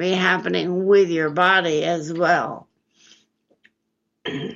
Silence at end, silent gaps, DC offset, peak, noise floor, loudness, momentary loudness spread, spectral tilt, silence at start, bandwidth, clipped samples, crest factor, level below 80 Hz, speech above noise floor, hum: 0 s; none; under 0.1%; -4 dBFS; -75 dBFS; -19 LUFS; 14 LU; -5 dB/octave; 0 s; 7.6 kHz; under 0.1%; 18 dB; -70 dBFS; 56 dB; none